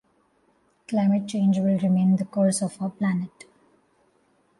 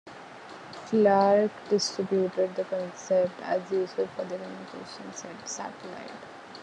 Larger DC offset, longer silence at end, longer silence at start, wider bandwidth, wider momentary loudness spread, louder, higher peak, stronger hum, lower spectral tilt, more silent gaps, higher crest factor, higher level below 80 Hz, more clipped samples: neither; first, 1.3 s vs 0 s; first, 0.9 s vs 0.05 s; about the same, 11.5 kHz vs 10.5 kHz; second, 8 LU vs 20 LU; first, -23 LUFS vs -27 LUFS; about the same, -10 dBFS vs -10 dBFS; neither; first, -7 dB/octave vs -4.5 dB/octave; neither; about the same, 14 dB vs 18 dB; first, -68 dBFS vs -76 dBFS; neither